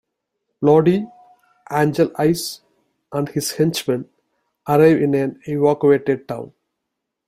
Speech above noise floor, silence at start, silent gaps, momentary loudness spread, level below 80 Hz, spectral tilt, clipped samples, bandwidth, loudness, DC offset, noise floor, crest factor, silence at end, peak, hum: 62 dB; 0.6 s; none; 16 LU; -58 dBFS; -6 dB/octave; under 0.1%; 16 kHz; -18 LUFS; under 0.1%; -79 dBFS; 18 dB; 0.8 s; -2 dBFS; none